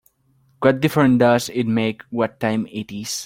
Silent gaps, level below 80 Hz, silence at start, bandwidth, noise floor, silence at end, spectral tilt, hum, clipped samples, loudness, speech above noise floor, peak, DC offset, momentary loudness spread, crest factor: none; -58 dBFS; 0.6 s; 17 kHz; -60 dBFS; 0 s; -5.5 dB/octave; none; under 0.1%; -19 LUFS; 41 dB; -2 dBFS; under 0.1%; 11 LU; 18 dB